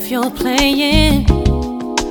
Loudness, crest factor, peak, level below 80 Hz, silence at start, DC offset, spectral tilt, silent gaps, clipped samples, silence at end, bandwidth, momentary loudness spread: -15 LUFS; 14 dB; 0 dBFS; -20 dBFS; 0 s; under 0.1%; -5 dB/octave; none; under 0.1%; 0 s; over 20 kHz; 8 LU